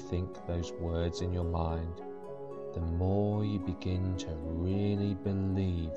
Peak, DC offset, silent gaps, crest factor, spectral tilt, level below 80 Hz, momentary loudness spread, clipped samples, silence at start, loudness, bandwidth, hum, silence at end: -20 dBFS; 0.3%; none; 12 dB; -8 dB/octave; -46 dBFS; 10 LU; under 0.1%; 0 s; -34 LUFS; 7.8 kHz; none; 0 s